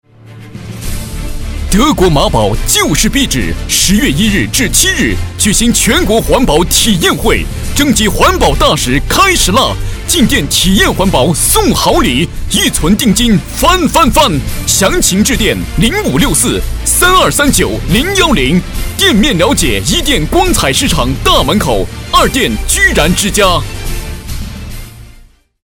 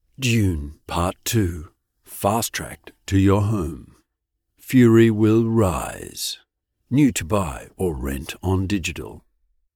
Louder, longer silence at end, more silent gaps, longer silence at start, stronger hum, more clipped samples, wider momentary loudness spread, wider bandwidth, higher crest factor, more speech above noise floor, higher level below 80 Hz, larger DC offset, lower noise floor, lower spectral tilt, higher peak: first, -9 LUFS vs -21 LUFS; about the same, 0.6 s vs 0.55 s; neither; about the same, 0.25 s vs 0.2 s; neither; first, 0.7% vs under 0.1%; second, 10 LU vs 15 LU; about the same, over 20 kHz vs 19 kHz; second, 10 dB vs 16 dB; second, 30 dB vs 57 dB; first, -18 dBFS vs -40 dBFS; neither; second, -40 dBFS vs -78 dBFS; second, -3.5 dB/octave vs -6 dB/octave; first, 0 dBFS vs -4 dBFS